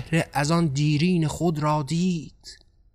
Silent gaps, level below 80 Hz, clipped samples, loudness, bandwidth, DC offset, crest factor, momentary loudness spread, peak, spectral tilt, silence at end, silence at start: none; -50 dBFS; under 0.1%; -24 LUFS; 14 kHz; under 0.1%; 14 dB; 5 LU; -10 dBFS; -6 dB/octave; 0.4 s; 0 s